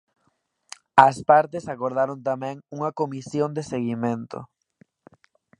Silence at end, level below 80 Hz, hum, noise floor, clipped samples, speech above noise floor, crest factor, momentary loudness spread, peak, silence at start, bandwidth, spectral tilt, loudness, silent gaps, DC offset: 1.15 s; -64 dBFS; none; -71 dBFS; under 0.1%; 48 dB; 24 dB; 17 LU; 0 dBFS; 0.95 s; 11 kHz; -6 dB/octave; -23 LUFS; none; under 0.1%